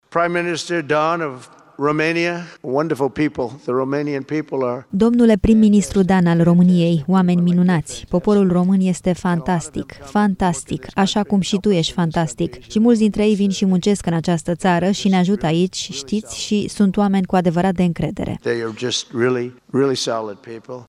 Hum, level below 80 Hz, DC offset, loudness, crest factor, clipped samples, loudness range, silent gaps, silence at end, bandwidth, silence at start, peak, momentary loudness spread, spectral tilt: none; -42 dBFS; under 0.1%; -18 LUFS; 14 dB; under 0.1%; 5 LU; none; 0.05 s; 11.5 kHz; 0.1 s; -2 dBFS; 9 LU; -6 dB/octave